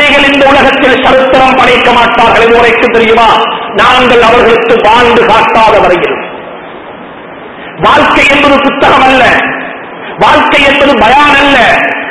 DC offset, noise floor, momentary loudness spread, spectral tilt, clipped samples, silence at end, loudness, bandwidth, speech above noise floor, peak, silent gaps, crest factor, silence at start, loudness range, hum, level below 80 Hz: 1%; -25 dBFS; 18 LU; -4 dB/octave; 8%; 0 s; -4 LUFS; 11 kHz; 20 dB; 0 dBFS; none; 6 dB; 0 s; 3 LU; none; -30 dBFS